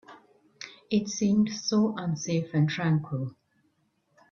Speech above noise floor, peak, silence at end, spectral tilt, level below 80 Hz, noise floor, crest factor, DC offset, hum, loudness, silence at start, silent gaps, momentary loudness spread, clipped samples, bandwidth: 45 dB; -12 dBFS; 1 s; -6 dB/octave; -66 dBFS; -71 dBFS; 16 dB; under 0.1%; none; -27 LUFS; 0.1 s; none; 14 LU; under 0.1%; 7.2 kHz